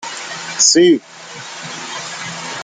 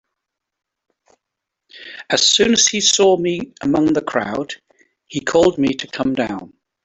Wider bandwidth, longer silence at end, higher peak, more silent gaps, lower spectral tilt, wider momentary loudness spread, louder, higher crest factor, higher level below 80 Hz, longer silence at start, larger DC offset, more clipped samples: first, 9.8 kHz vs 8.4 kHz; second, 0 s vs 0.35 s; about the same, 0 dBFS vs -2 dBFS; neither; about the same, -2 dB/octave vs -2.5 dB/octave; first, 20 LU vs 17 LU; about the same, -15 LUFS vs -16 LUFS; about the same, 18 dB vs 18 dB; second, -64 dBFS vs -54 dBFS; second, 0 s vs 1.75 s; neither; neither